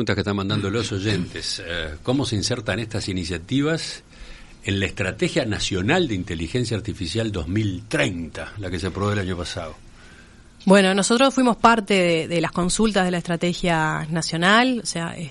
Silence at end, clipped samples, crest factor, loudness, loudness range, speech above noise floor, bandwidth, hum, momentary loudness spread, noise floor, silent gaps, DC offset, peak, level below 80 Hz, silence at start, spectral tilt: 0 s; under 0.1%; 22 dB; -22 LUFS; 7 LU; 25 dB; 11.5 kHz; none; 11 LU; -47 dBFS; none; under 0.1%; 0 dBFS; -44 dBFS; 0 s; -4.5 dB/octave